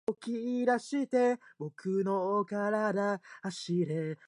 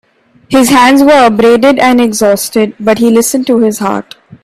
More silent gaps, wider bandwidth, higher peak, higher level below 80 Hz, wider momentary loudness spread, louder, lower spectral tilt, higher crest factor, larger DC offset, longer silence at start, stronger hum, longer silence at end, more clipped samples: neither; second, 11.5 kHz vs 16 kHz; second, -16 dBFS vs 0 dBFS; second, -84 dBFS vs -46 dBFS; about the same, 9 LU vs 8 LU; second, -32 LUFS vs -8 LUFS; first, -6.5 dB/octave vs -4 dB/octave; first, 16 dB vs 8 dB; neither; second, 0.1 s vs 0.5 s; neither; second, 0.15 s vs 0.4 s; neither